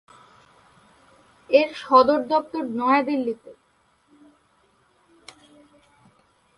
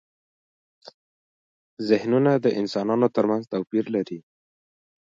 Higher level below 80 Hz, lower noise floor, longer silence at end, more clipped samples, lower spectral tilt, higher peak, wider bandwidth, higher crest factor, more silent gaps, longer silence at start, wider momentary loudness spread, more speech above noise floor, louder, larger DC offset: about the same, -68 dBFS vs -72 dBFS; second, -64 dBFS vs under -90 dBFS; first, 3.05 s vs 0.9 s; neither; second, -5 dB/octave vs -7.5 dB/octave; about the same, -4 dBFS vs -6 dBFS; first, 11.5 kHz vs 7.6 kHz; about the same, 22 dB vs 20 dB; second, none vs 0.94-1.77 s; first, 1.5 s vs 0.85 s; about the same, 12 LU vs 10 LU; second, 44 dB vs over 68 dB; about the same, -21 LUFS vs -23 LUFS; neither